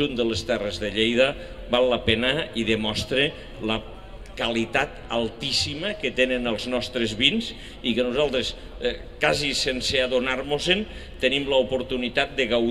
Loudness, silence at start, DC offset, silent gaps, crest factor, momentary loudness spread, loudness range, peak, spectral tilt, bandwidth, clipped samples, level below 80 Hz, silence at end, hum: -24 LUFS; 0 s; 0.4%; none; 22 dB; 8 LU; 2 LU; -2 dBFS; -4 dB/octave; 13.5 kHz; under 0.1%; -42 dBFS; 0 s; none